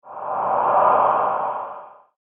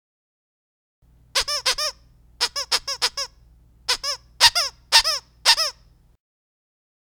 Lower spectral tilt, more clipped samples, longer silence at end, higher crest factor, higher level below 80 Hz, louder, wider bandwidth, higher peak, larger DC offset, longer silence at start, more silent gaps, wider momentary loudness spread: first, -4 dB/octave vs 2.5 dB/octave; neither; second, 0.35 s vs 1.45 s; second, 16 dB vs 26 dB; second, -66 dBFS vs -52 dBFS; about the same, -19 LUFS vs -20 LUFS; second, 3.7 kHz vs over 20 kHz; second, -4 dBFS vs 0 dBFS; neither; second, 0.05 s vs 1.35 s; neither; first, 15 LU vs 11 LU